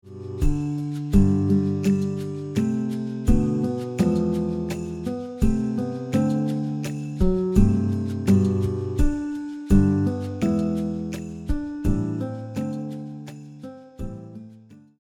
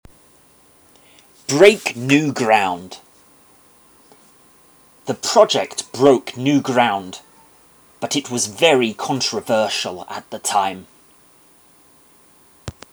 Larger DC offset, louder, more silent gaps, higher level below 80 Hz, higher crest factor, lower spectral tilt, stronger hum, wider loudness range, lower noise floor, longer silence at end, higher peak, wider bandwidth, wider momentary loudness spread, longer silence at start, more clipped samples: neither; second, -24 LUFS vs -17 LUFS; neither; first, -30 dBFS vs -60 dBFS; about the same, 18 dB vs 20 dB; first, -8.5 dB/octave vs -3.5 dB/octave; neither; about the same, 7 LU vs 5 LU; second, -48 dBFS vs -52 dBFS; about the same, 0.2 s vs 0.2 s; second, -4 dBFS vs 0 dBFS; second, 13.5 kHz vs over 20 kHz; second, 16 LU vs 21 LU; second, 0.05 s vs 1.5 s; neither